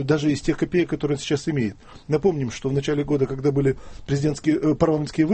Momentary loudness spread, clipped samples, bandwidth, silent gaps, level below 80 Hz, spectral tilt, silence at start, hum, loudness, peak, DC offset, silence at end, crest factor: 5 LU; under 0.1%; 8.8 kHz; none; -44 dBFS; -7 dB/octave; 0 s; none; -23 LUFS; -4 dBFS; under 0.1%; 0 s; 18 dB